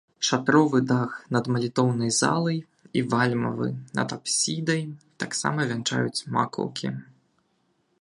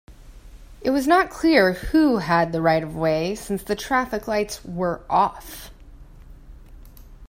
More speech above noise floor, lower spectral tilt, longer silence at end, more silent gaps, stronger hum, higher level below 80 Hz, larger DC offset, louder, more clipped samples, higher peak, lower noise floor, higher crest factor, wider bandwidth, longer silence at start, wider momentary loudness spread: first, 45 dB vs 23 dB; about the same, -4.5 dB/octave vs -5.5 dB/octave; first, 1 s vs 0 s; neither; neither; second, -66 dBFS vs -44 dBFS; neither; second, -25 LUFS vs -21 LUFS; neither; second, -6 dBFS vs -2 dBFS; first, -70 dBFS vs -44 dBFS; about the same, 20 dB vs 20 dB; second, 11.5 kHz vs 16 kHz; about the same, 0.2 s vs 0.1 s; about the same, 9 LU vs 11 LU